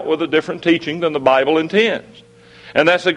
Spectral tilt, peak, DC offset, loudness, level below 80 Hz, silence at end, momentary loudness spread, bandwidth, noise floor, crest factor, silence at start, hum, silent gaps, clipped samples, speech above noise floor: -5.5 dB/octave; 0 dBFS; under 0.1%; -16 LUFS; -58 dBFS; 0 s; 6 LU; 10 kHz; -42 dBFS; 16 dB; 0 s; none; none; under 0.1%; 26 dB